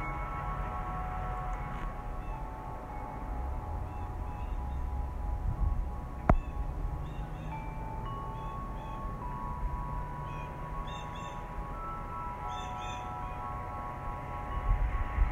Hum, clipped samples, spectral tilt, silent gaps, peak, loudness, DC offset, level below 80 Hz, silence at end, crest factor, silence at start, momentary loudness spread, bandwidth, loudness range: none; under 0.1%; -7 dB/octave; none; -8 dBFS; -38 LUFS; under 0.1%; -38 dBFS; 0 s; 28 dB; 0 s; 7 LU; 9.4 kHz; 4 LU